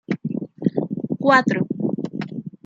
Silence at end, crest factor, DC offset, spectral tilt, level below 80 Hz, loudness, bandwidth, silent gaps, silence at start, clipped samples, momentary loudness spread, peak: 0.15 s; 20 dB; under 0.1%; -7 dB/octave; -64 dBFS; -22 LUFS; 8 kHz; none; 0.1 s; under 0.1%; 13 LU; -2 dBFS